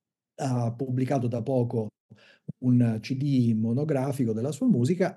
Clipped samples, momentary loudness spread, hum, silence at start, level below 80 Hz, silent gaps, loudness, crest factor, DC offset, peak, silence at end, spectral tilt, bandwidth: under 0.1%; 8 LU; none; 0.4 s; -76 dBFS; 2.00-2.09 s; -27 LUFS; 16 dB; under 0.1%; -10 dBFS; 0 s; -8 dB/octave; 12.5 kHz